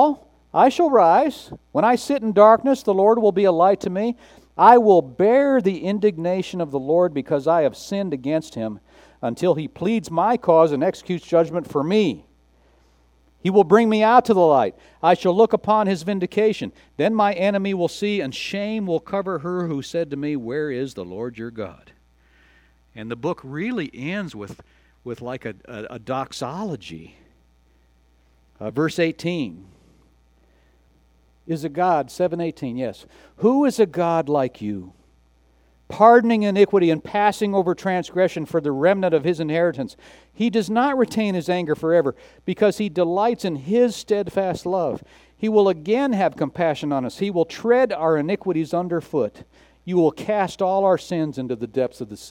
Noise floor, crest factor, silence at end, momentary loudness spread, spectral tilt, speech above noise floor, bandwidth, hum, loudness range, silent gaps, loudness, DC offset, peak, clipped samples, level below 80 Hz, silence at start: -58 dBFS; 20 dB; 0 s; 15 LU; -6.5 dB/octave; 38 dB; 16 kHz; none; 13 LU; none; -20 LUFS; under 0.1%; 0 dBFS; under 0.1%; -58 dBFS; 0 s